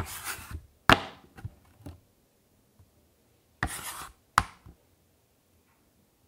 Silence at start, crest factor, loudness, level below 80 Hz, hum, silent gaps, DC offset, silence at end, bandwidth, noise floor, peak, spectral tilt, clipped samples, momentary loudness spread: 0 s; 34 dB; -29 LUFS; -50 dBFS; none; none; under 0.1%; 1.75 s; 16 kHz; -67 dBFS; 0 dBFS; -3.5 dB/octave; under 0.1%; 27 LU